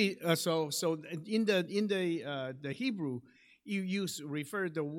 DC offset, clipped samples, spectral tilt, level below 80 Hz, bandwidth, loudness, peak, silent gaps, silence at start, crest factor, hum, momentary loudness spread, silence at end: under 0.1%; under 0.1%; -4.5 dB/octave; -82 dBFS; 17 kHz; -34 LUFS; -16 dBFS; none; 0 s; 18 dB; none; 9 LU; 0 s